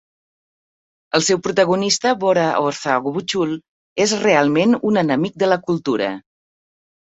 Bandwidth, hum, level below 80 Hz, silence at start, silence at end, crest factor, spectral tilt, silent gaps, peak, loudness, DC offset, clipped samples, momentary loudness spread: 8.4 kHz; none; -62 dBFS; 1.15 s; 1 s; 18 dB; -4 dB/octave; 3.69-3.96 s; -2 dBFS; -18 LUFS; under 0.1%; under 0.1%; 7 LU